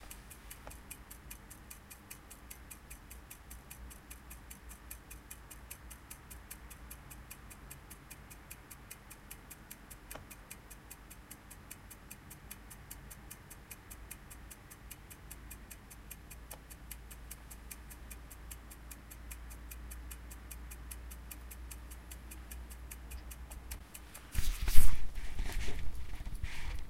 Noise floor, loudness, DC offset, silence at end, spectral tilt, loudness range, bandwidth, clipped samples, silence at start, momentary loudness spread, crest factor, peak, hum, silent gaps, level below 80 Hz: -53 dBFS; -48 LUFS; under 0.1%; 0.05 s; -3.5 dB/octave; 9 LU; 16 kHz; under 0.1%; 20.1 s; 8 LU; 28 dB; -4 dBFS; none; none; -42 dBFS